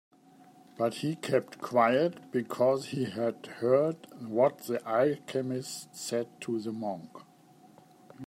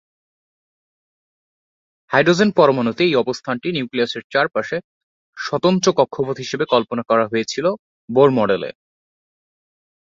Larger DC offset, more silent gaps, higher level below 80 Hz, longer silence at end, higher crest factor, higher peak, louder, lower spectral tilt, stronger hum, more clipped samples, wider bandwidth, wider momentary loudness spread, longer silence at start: neither; second, none vs 4.24-4.30 s, 4.84-5.33 s, 7.79-8.08 s; second, -80 dBFS vs -62 dBFS; second, 0 s vs 1.4 s; about the same, 20 dB vs 18 dB; second, -12 dBFS vs -2 dBFS; second, -30 LUFS vs -18 LUFS; about the same, -5.5 dB/octave vs -5 dB/octave; neither; neither; first, 16 kHz vs 7.8 kHz; about the same, 10 LU vs 9 LU; second, 0.75 s vs 2.1 s